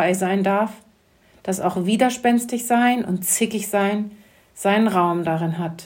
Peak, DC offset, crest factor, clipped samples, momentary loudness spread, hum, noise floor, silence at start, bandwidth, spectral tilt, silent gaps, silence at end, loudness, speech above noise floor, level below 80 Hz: -4 dBFS; under 0.1%; 16 dB; under 0.1%; 8 LU; none; -56 dBFS; 0 s; 16.5 kHz; -4.5 dB/octave; none; 0 s; -20 LUFS; 36 dB; -64 dBFS